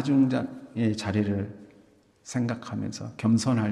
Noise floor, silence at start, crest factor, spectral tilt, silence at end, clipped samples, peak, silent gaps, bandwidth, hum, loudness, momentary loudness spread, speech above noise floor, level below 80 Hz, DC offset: -59 dBFS; 0 s; 14 dB; -6.5 dB/octave; 0 s; under 0.1%; -12 dBFS; none; 11.5 kHz; none; -28 LUFS; 11 LU; 33 dB; -64 dBFS; under 0.1%